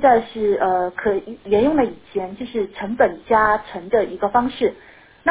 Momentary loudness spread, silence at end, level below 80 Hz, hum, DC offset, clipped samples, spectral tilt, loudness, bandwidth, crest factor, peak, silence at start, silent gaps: 10 LU; 0 s; -48 dBFS; none; under 0.1%; under 0.1%; -9.5 dB/octave; -20 LUFS; 4 kHz; 18 dB; -2 dBFS; 0 s; none